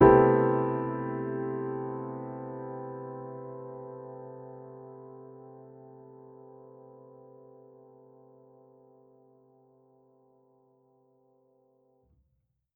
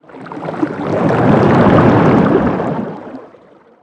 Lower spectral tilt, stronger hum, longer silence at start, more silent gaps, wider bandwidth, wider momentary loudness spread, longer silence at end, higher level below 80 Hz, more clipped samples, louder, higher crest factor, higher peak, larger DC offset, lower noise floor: about the same, -8.5 dB/octave vs -9 dB/octave; neither; second, 0 s vs 0.15 s; neither; second, 3.4 kHz vs 9 kHz; first, 26 LU vs 17 LU; first, 6 s vs 0.55 s; second, -56 dBFS vs -38 dBFS; neither; second, -30 LUFS vs -12 LUFS; first, 28 dB vs 12 dB; second, -4 dBFS vs 0 dBFS; neither; first, -76 dBFS vs -44 dBFS